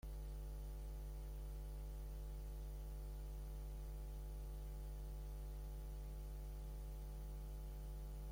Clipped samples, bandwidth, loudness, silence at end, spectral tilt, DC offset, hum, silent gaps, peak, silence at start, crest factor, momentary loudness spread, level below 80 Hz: under 0.1%; 16.5 kHz; -52 LUFS; 0 s; -6.5 dB/octave; under 0.1%; 50 Hz at -50 dBFS; none; -42 dBFS; 0.05 s; 8 dB; 0 LU; -48 dBFS